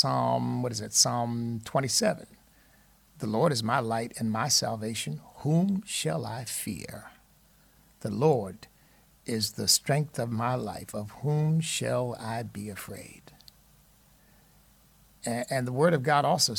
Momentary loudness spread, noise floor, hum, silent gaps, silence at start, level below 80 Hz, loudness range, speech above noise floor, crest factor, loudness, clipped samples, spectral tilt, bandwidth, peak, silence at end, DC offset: 15 LU; -61 dBFS; none; none; 0 s; -64 dBFS; 6 LU; 33 dB; 22 dB; -28 LUFS; under 0.1%; -4 dB/octave; 18.5 kHz; -8 dBFS; 0 s; under 0.1%